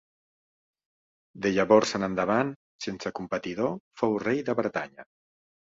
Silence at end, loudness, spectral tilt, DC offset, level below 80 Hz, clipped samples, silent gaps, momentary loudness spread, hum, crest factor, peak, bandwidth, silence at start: 0.75 s; -27 LUFS; -5.5 dB/octave; under 0.1%; -64 dBFS; under 0.1%; 2.56-2.79 s, 3.80-3.91 s; 13 LU; none; 22 dB; -6 dBFS; 7.8 kHz; 1.35 s